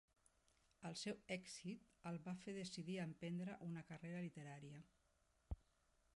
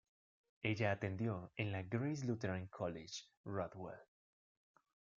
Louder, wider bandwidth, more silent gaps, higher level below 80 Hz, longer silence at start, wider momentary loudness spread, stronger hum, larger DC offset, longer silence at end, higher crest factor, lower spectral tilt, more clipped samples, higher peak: second, -52 LUFS vs -43 LUFS; first, 11.5 kHz vs 7.6 kHz; second, none vs 3.37-3.44 s; first, -68 dBFS vs -76 dBFS; first, 0.8 s vs 0.65 s; second, 8 LU vs 11 LU; neither; neither; second, 0.6 s vs 1.15 s; about the same, 18 dB vs 22 dB; about the same, -5.5 dB/octave vs -6.5 dB/octave; neither; second, -34 dBFS vs -22 dBFS